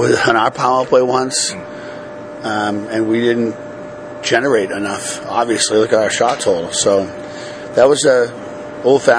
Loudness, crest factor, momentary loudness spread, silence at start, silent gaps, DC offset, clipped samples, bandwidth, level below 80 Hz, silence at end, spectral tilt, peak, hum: -15 LUFS; 16 dB; 16 LU; 0 s; none; under 0.1%; under 0.1%; 10.5 kHz; -54 dBFS; 0 s; -3.5 dB/octave; 0 dBFS; none